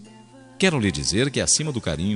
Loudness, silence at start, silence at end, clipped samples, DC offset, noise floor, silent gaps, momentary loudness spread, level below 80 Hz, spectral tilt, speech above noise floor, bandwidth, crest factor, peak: -21 LUFS; 0 s; 0 s; under 0.1%; under 0.1%; -47 dBFS; none; 5 LU; -46 dBFS; -3.5 dB/octave; 25 dB; 11 kHz; 18 dB; -6 dBFS